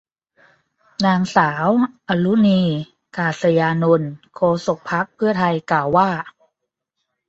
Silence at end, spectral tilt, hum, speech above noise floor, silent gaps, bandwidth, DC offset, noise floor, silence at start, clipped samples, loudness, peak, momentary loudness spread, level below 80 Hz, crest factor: 1 s; -7 dB/octave; none; 61 dB; none; 8 kHz; under 0.1%; -79 dBFS; 1 s; under 0.1%; -18 LUFS; -2 dBFS; 9 LU; -58 dBFS; 18 dB